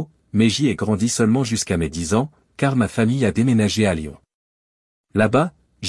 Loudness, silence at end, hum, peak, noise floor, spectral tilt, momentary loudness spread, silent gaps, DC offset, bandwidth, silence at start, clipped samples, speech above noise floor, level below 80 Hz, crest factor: -20 LUFS; 0 s; none; -2 dBFS; under -90 dBFS; -5.5 dB/octave; 8 LU; 4.34-5.04 s; under 0.1%; 12 kHz; 0 s; under 0.1%; over 72 dB; -48 dBFS; 18 dB